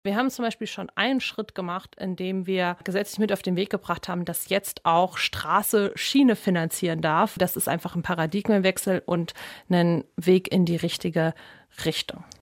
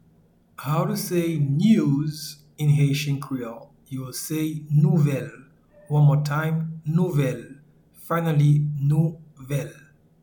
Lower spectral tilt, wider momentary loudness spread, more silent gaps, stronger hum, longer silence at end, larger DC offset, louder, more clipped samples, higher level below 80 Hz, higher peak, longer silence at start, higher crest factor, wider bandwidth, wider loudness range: second, -5 dB/octave vs -7 dB/octave; second, 10 LU vs 16 LU; neither; neither; second, 0.2 s vs 0.5 s; neither; about the same, -25 LUFS vs -23 LUFS; neither; about the same, -60 dBFS vs -58 dBFS; about the same, -6 dBFS vs -6 dBFS; second, 0.05 s vs 0.6 s; about the same, 18 dB vs 16 dB; second, 17 kHz vs 19 kHz; about the same, 4 LU vs 2 LU